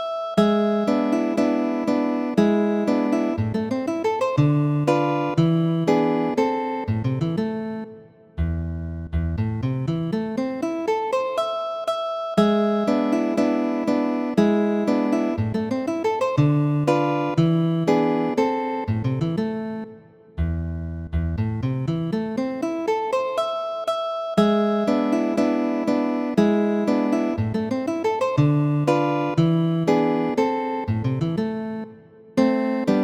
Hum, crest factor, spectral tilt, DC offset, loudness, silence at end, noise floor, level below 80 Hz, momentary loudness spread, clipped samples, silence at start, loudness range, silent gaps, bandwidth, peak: none; 18 dB; -8 dB/octave; under 0.1%; -22 LUFS; 0 s; -45 dBFS; -42 dBFS; 7 LU; under 0.1%; 0 s; 5 LU; none; 12.5 kHz; -4 dBFS